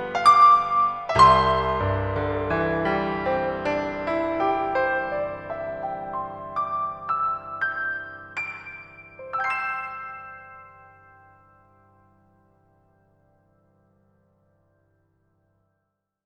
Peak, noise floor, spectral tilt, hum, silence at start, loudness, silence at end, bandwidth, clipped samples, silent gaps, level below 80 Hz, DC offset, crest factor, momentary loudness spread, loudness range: -2 dBFS; -78 dBFS; -5.5 dB/octave; none; 0 s; -23 LUFS; 5.55 s; 11 kHz; under 0.1%; none; -46 dBFS; under 0.1%; 22 dB; 19 LU; 12 LU